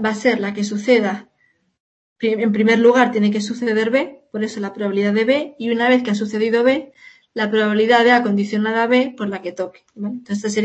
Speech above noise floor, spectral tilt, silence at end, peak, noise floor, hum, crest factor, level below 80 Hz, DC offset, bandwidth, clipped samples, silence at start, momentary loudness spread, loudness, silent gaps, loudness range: 45 dB; -5.5 dB/octave; 0 s; -2 dBFS; -63 dBFS; none; 16 dB; -68 dBFS; under 0.1%; 8.6 kHz; under 0.1%; 0 s; 13 LU; -18 LUFS; 1.80-2.16 s; 2 LU